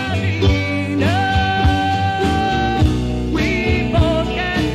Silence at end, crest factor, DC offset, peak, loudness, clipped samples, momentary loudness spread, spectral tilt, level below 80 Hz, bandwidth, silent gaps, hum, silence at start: 0 s; 14 dB; under 0.1%; -2 dBFS; -17 LUFS; under 0.1%; 3 LU; -6.5 dB/octave; -26 dBFS; 12.5 kHz; none; none; 0 s